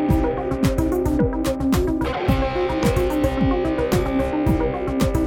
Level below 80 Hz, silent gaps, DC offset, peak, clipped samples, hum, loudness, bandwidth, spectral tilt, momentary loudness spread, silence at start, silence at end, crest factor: -28 dBFS; none; under 0.1%; -6 dBFS; under 0.1%; none; -21 LUFS; over 20 kHz; -7 dB/octave; 2 LU; 0 s; 0 s; 14 dB